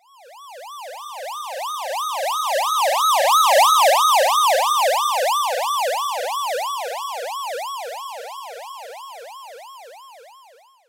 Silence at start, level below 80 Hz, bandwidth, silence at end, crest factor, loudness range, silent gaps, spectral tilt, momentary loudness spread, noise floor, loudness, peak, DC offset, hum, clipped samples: 0.25 s; -84 dBFS; 16 kHz; 0.6 s; 14 dB; 15 LU; none; 4.5 dB/octave; 23 LU; -51 dBFS; -19 LUFS; -8 dBFS; under 0.1%; none; under 0.1%